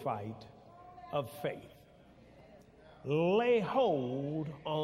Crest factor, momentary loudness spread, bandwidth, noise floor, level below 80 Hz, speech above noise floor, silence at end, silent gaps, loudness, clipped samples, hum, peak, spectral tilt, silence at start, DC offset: 16 dB; 21 LU; 15.5 kHz; -59 dBFS; -68 dBFS; 26 dB; 0 s; none; -33 LUFS; under 0.1%; none; -18 dBFS; -7.5 dB/octave; 0 s; under 0.1%